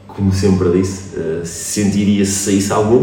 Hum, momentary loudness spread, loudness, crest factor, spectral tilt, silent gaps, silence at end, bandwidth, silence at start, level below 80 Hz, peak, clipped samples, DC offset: none; 8 LU; -16 LUFS; 14 dB; -5.5 dB/octave; none; 0 s; 17.5 kHz; 0.05 s; -46 dBFS; 0 dBFS; under 0.1%; under 0.1%